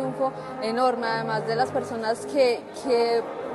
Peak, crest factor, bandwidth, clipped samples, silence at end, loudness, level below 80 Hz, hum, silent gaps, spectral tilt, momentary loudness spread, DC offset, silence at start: -10 dBFS; 16 dB; 12 kHz; under 0.1%; 0 s; -25 LUFS; -68 dBFS; none; none; -5 dB/octave; 6 LU; under 0.1%; 0 s